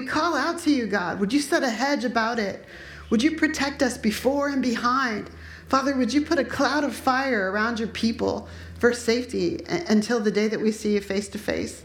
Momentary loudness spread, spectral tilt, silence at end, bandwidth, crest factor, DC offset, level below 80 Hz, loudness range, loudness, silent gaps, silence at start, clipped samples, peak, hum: 7 LU; -4.5 dB/octave; 0 s; 17 kHz; 18 dB; under 0.1%; -50 dBFS; 1 LU; -24 LUFS; none; 0 s; under 0.1%; -6 dBFS; none